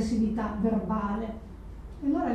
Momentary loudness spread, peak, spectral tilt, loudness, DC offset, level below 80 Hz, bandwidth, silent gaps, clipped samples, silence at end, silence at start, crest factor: 17 LU; -16 dBFS; -7.5 dB/octave; -30 LUFS; under 0.1%; -42 dBFS; 9.4 kHz; none; under 0.1%; 0 s; 0 s; 14 dB